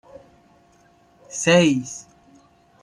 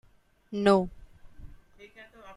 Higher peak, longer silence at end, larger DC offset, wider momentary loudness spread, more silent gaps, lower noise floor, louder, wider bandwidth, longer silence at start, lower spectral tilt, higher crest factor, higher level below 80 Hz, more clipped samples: first, -4 dBFS vs -8 dBFS; first, 0.8 s vs 0.05 s; neither; second, 19 LU vs 26 LU; neither; first, -56 dBFS vs -52 dBFS; first, -18 LUFS vs -26 LUFS; about the same, 11.5 kHz vs 11.5 kHz; first, 1.3 s vs 0.5 s; second, -4.5 dB/octave vs -6.5 dB/octave; about the same, 20 dB vs 22 dB; second, -62 dBFS vs -52 dBFS; neither